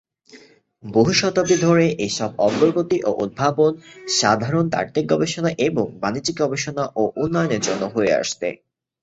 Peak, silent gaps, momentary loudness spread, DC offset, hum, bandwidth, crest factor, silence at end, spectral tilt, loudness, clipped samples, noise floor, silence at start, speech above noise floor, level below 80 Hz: -2 dBFS; none; 7 LU; under 0.1%; none; 8.2 kHz; 18 dB; 0.5 s; -4.5 dB/octave; -20 LUFS; under 0.1%; -49 dBFS; 0.35 s; 29 dB; -54 dBFS